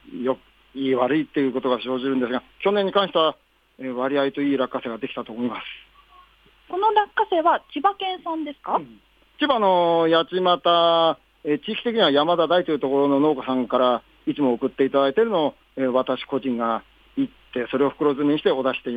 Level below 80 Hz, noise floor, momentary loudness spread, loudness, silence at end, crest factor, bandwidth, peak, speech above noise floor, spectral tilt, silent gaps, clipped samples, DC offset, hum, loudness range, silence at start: -62 dBFS; -55 dBFS; 11 LU; -22 LUFS; 0 s; 16 dB; 5 kHz; -6 dBFS; 33 dB; -7.5 dB/octave; none; under 0.1%; under 0.1%; none; 5 LU; 0.05 s